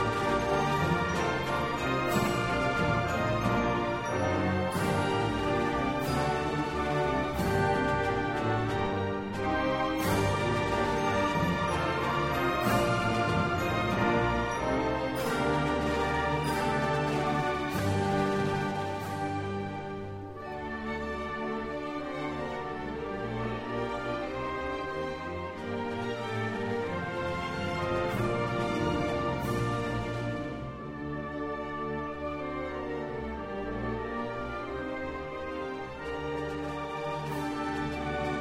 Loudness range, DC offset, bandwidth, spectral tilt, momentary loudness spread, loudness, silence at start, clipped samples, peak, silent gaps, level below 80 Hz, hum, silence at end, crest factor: 7 LU; under 0.1%; 16 kHz; -6 dB/octave; 8 LU; -31 LUFS; 0 s; under 0.1%; -14 dBFS; none; -48 dBFS; none; 0 s; 16 dB